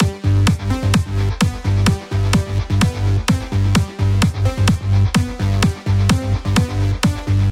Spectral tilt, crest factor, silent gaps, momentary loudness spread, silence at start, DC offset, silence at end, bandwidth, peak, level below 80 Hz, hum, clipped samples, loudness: -6 dB/octave; 16 dB; none; 3 LU; 0 s; under 0.1%; 0 s; 15 kHz; 0 dBFS; -28 dBFS; none; under 0.1%; -17 LUFS